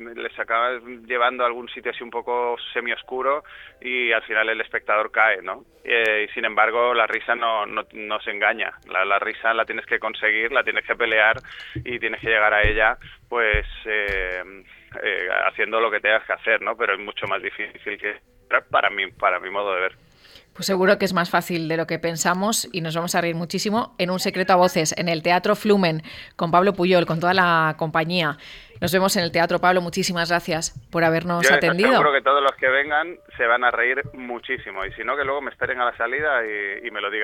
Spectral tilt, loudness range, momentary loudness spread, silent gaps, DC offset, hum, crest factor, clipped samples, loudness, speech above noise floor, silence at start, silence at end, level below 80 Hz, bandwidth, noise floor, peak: -4 dB/octave; 5 LU; 11 LU; none; under 0.1%; none; 18 dB; under 0.1%; -21 LUFS; 28 dB; 0 s; 0 s; -46 dBFS; 17.5 kHz; -50 dBFS; -4 dBFS